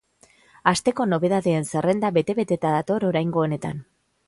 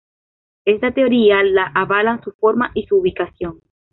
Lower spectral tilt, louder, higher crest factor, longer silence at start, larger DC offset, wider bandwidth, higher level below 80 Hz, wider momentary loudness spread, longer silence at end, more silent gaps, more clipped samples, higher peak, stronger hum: second, -6 dB/octave vs -9.5 dB/octave; second, -23 LUFS vs -16 LUFS; first, 22 dB vs 14 dB; about the same, 0.65 s vs 0.65 s; neither; first, 11.5 kHz vs 4.1 kHz; second, -58 dBFS vs -48 dBFS; second, 4 LU vs 11 LU; about the same, 0.45 s vs 0.4 s; second, none vs 2.34-2.39 s; neither; about the same, -2 dBFS vs -2 dBFS; neither